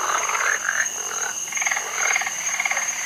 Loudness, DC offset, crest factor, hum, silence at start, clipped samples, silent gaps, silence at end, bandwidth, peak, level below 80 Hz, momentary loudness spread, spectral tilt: -22 LUFS; under 0.1%; 18 dB; none; 0 s; under 0.1%; none; 0 s; 16 kHz; -6 dBFS; -68 dBFS; 4 LU; 2 dB/octave